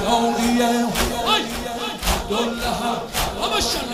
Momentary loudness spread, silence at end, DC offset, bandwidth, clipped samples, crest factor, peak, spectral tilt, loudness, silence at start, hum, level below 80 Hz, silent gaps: 6 LU; 0 s; 0.2%; 16 kHz; under 0.1%; 16 dB; -6 dBFS; -3 dB/octave; -21 LUFS; 0 s; none; -34 dBFS; none